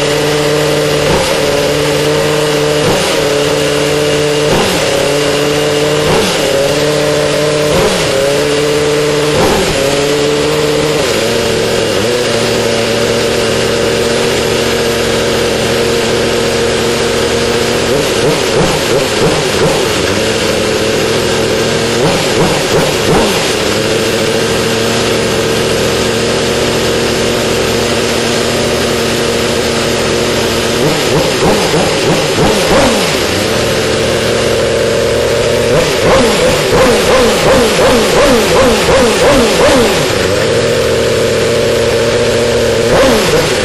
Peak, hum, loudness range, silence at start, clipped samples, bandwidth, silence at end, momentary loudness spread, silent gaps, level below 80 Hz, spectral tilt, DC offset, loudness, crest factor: 0 dBFS; none; 3 LU; 0 s; under 0.1%; 13 kHz; 0 s; 3 LU; none; -30 dBFS; -3.5 dB/octave; under 0.1%; -10 LUFS; 10 dB